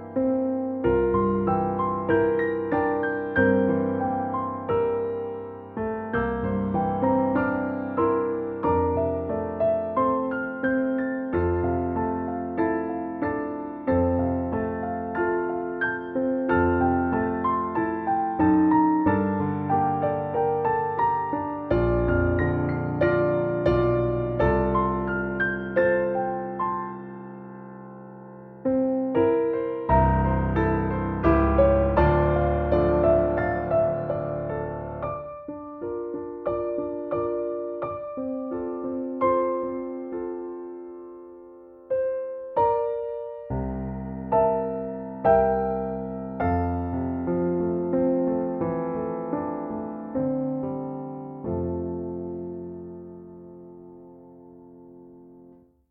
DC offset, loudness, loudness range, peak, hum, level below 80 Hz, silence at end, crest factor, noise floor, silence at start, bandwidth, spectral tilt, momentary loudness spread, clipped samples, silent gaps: under 0.1%; -25 LUFS; 8 LU; -8 dBFS; none; -40 dBFS; 0.4 s; 18 dB; -53 dBFS; 0 s; 4.5 kHz; -11 dB/octave; 12 LU; under 0.1%; none